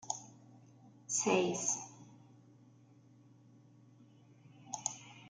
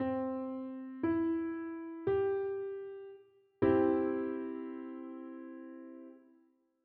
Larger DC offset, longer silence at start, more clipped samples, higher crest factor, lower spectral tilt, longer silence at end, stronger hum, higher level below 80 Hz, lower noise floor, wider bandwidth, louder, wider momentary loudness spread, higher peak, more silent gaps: neither; about the same, 0.05 s vs 0 s; neither; about the same, 24 dB vs 20 dB; second, -3 dB/octave vs -7.5 dB/octave; second, 0 s vs 0.65 s; neither; second, -84 dBFS vs -70 dBFS; second, -63 dBFS vs -70 dBFS; first, 10.5 kHz vs 4.3 kHz; about the same, -36 LUFS vs -35 LUFS; first, 26 LU vs 19 LU; about the same, -18 dBFS vs -16 dBFS; neither